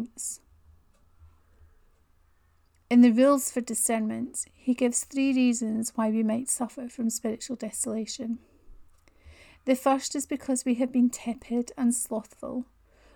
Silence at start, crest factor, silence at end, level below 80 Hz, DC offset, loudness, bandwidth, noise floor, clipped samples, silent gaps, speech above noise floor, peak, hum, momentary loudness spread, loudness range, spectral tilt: 0 s; 18 dB; 0.55 s; -62 dBFS; under 0.1%; -27 LUFS; 19.5 kHz; -64 dBFS; under 0.1%; none; 38 dB; -10 dBFS; none; 13 LU; 6 LU; -4 dB/octave